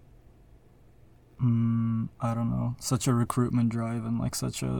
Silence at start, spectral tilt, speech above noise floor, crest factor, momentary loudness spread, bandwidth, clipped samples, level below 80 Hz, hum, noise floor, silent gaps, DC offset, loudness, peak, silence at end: 1.4 s; -6.5 dB/octave; 28 dB; 18 dB; 5 LU; 18 kHz; under 0.1%; -52 dBFS; none; -56 dBFS; none; under 0.1%; -28 LUFS; -12 dBFS; 0 s